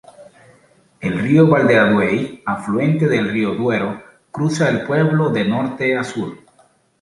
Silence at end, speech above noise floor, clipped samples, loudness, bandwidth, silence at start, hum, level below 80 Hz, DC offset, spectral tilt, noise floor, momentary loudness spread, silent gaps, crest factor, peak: 0.65 s; 39 dB; under 0.1%; -17 LUFS; 11.5 kHz; 0.2 s; none; -54 dBFS; under 0.1%; -7 dB/octave; -55 dBFS; 13 LU; none; 16 dB; -2 dBFS